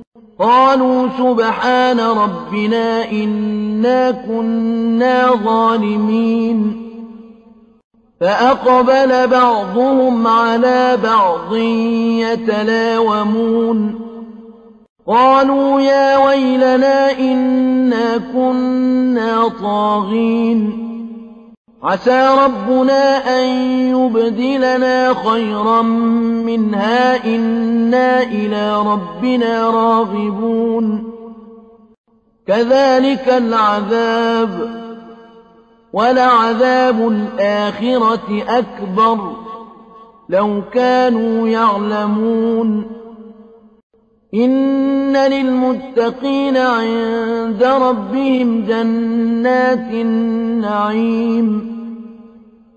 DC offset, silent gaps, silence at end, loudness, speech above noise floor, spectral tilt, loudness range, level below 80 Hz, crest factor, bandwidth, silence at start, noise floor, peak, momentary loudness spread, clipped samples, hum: under 0.1%; 0.07-0.12 s, 7.84-7.90 s, 14.89-14.96 s, 21.57-21.65 s, 31.98-32.04 s, 43.83-43.90 s; 0.5 s; -14 LUFS; 34 dB; -6.5 dB/octave; 4 LU; -54 dBFS; 12 dB; 7.8 kHz; 0 s; -47 dBFS; -2 dBFS; 8 LU; under 0.1%; none